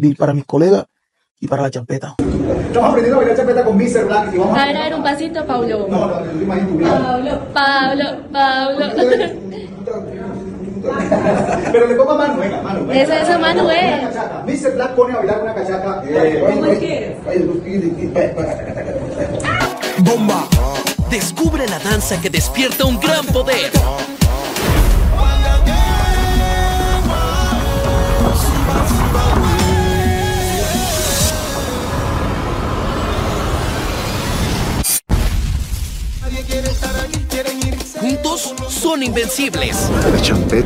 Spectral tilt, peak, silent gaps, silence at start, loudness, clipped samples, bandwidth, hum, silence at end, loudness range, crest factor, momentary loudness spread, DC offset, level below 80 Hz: -5 dB/octave; 0 dBFS; 1.31-1.35 s; 0 s; -16 LUFS; under 0.1%; 16.5 kHz; none; 0 s; 4 LU; 16 dB; 8 LU; under 0.1%; -22 dBFS